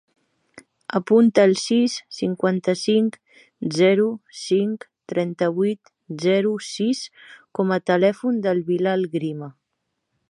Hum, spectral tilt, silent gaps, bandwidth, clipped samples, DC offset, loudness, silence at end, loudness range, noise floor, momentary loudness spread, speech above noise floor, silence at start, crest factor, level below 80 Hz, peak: none; -5.5 dB/octave; none; 11.5 kHz; under 0.1%; under 0.1%; -21 LUFS; 0.8 s; 3 LU; -77 dBFS; 14 LU; 56 dB; 0.55 s; 18 dB; -72 dBFS; -2 dBFS